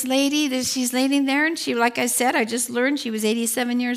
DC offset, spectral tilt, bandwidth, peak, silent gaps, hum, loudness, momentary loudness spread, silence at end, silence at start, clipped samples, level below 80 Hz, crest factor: under 0.1%; -2 dB/octave; 16 kHz; -6 dBFS; none; none; -21 LUFS; 3 LU; 0 s; 0 s; under 0.1%; -72 dBFS; 16 dB